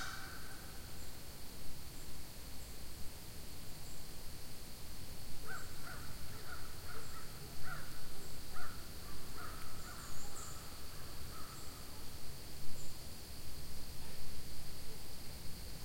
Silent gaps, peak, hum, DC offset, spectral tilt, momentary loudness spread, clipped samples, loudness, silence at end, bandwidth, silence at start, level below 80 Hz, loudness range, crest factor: none; -22 dBFS; none; 0.5%; -3 dB/octave; 3 LU; under 0.1%; -50 LUFS; 0 s; 16.5 kHz; 0 s; -52 dBFS; 2 LU; 14 dB